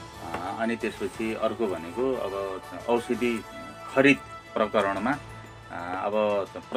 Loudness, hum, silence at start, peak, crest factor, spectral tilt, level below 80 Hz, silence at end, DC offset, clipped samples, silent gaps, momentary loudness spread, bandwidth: -28 LUFS; none; 0 s; -6 dBFS; 22 dB; -5.5 dB/octave; -56 dBFS; 0 s; under 0.1%; under 0.1%; none; 14 LU; 15.5 kHz